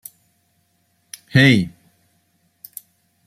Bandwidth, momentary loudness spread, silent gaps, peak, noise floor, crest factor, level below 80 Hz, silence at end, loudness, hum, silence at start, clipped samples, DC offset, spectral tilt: 15.5 kHz; 27 LU; none; -2 dBFS; -65 dBFS; 22 dB; -56 dBFS; 1.6 s; -16 LUFS; none; 1.35 s; under 0.1%; under 0.1%; -5.5 dB/octave